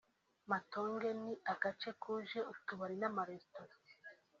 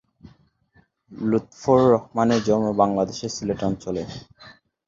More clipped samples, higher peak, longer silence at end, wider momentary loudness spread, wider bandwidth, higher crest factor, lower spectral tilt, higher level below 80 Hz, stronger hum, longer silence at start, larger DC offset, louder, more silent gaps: neither; second, -22 dBFS vs -4 dBFS; about the same, 0.25 s vs 0.35 s; first, 19 LU vs 12 LU; about the same, 7.6 kHz vs 7.6 kHz; about the same, 22 dB vs 20 dB; second, -3 dB/octave vs -6.5 dB/octave; second, -86 dBFS vs -52 dBFS; neither; second, 0.45 s vs 1.1 s; neither; second, -42 LUFS vs -22 LUFS; neither